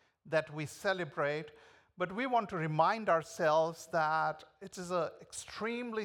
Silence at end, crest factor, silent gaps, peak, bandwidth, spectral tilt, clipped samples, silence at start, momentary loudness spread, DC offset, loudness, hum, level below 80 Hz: 0 s; 20 dB; none; -16 dBFS; 17 kHz; -5 dB/octave; under 0.1%; 0.25 s; 13 LU; under 0.1%; -34 LUFS; none; -74 dBFS